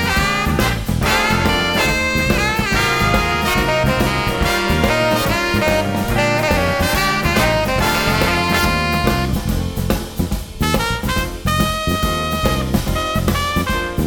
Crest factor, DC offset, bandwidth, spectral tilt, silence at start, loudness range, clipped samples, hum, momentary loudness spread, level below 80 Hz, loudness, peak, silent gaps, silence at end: 16 dB; under 0.1%; over 20 kHz; -4.5 dB/octave; 0 s; 3 LU; under 0.1%; none; 5 LU; -26 dBFS; -17 LUFS; 0 dBFS; none; 0 s